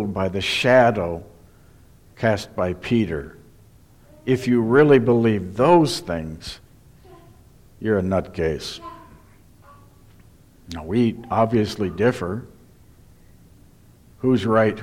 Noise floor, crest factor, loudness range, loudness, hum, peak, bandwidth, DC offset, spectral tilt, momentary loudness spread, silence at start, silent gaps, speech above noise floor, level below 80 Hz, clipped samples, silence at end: -50 dBFS; 18 dB; 9 LU; -20 LUFS; none; -4 dBFS; 15.5 kHz; under 0.1%; -6.5 dB/octave; 18 LU; 0 s; none; 31 dB; -48 dBFS; under 0.1%; 0 s